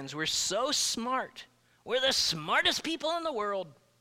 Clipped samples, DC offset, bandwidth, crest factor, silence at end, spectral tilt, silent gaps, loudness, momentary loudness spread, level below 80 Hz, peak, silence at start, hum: under 0.1%; under 0.1%; 16.5 kHz; 18 dB; 0.3 s; -1.5 dB/octave; none; -29 LUFS; 10 LU; -64 dBFS; -14 dBFS; 0 s; none